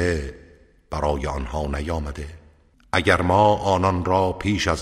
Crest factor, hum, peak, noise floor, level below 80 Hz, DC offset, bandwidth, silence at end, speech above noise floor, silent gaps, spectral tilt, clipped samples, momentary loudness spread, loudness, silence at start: 20 dB; none; -2 dBFS; -54 dBFS; -34 dBFS; under 0.1%; 14 kHz; 0 s; 33 dB; none; -5.5 dB/octave; under 0.1%; 15 LU; -22 LUFS; 0 s